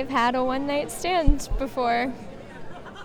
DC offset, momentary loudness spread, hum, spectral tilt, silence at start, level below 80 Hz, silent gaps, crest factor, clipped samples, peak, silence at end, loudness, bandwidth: under 0.1%; 18 LU; none; -5 dB/octave; 0 s; -30 dBFS; none; 20 dB; under 0.1%; -4 dBFS; 0 s; -25 LUFS; 15.5 kHz